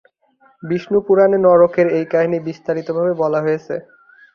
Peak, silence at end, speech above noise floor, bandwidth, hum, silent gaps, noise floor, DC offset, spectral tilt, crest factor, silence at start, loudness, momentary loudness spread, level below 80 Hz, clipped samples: -2 dBFS; 0.55 s; 40 dB; 6.6 kHz; none; none; -55 dBFS; under 0.1%; -8.5 dB/octave; 16 dB; 0.65 s; -16 LUFS; 12 LU; -58 dBFS; under 0.1%